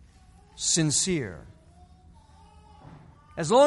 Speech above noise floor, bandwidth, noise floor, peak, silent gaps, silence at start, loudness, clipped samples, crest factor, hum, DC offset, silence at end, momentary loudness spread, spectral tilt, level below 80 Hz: 31 dB; 11.5 kHz; -54 dBFS; -8 dBFS; none; 0.55 s; -25 LUFS; under 0.1%; 20 dB; none; under 0.1%; 0 s; 19 LU; -3.5 dB/octave; -56 dBFS